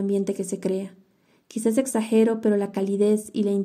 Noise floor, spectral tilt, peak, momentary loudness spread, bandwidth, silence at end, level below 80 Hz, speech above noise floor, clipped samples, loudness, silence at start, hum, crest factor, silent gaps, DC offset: -62 dBFS; -6 dB/octave; -8 dBFS; 8 LU; 15.5 kHz; 0 s; -76 dBFS; 39 dB; under 0.1%; -24 LUFS; 0 s; none; 14 dB; none; under 0.1%